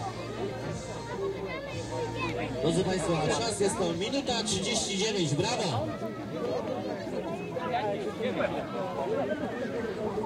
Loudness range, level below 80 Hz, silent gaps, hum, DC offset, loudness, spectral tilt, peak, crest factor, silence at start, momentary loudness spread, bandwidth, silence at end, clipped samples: 4 LU; -54 dBFS; none; none; under 0.1%; -31 LUFS; -4.5 dB/octave; -14 dBFS; 16 dB; 0 s; 8 LU; 15.5 kHz; 0 s; under 0.1%